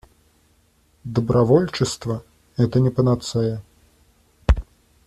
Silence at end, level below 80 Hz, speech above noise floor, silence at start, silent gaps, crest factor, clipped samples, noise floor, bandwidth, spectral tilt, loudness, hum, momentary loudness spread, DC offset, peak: 0.45 s; -32 dBFS; 41 dB; 1.05 s; none; 20 dB; under 0.1%; -60 dBFS; 12.5 kHz; -7 dB/octave; -21 LUFS; none; 13 LU; under 0.1%; -2 dBFS